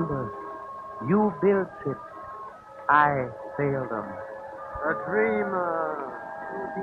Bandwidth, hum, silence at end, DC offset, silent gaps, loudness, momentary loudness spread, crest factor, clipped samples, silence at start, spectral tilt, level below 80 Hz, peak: 5.6 kHz; none; 0 s; under 0.1%; none; -27 LUFS; 16 LU; 20 dB; under 0.1%; 0 s; -9 dB/octave; -58 dBFS; -6 dBFS